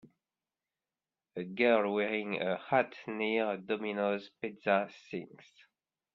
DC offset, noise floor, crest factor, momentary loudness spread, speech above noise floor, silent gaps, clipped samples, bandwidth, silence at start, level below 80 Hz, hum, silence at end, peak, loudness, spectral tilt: under 0.1%; under -90 dBFS; 22 dB; 15 LU; over 57 dB; none; under 0.1%; 7 kHz; 1.35 s; -78 dBFS; none; 0.75 s; -14 dBFS; -33 LUFS; -7 dB/octave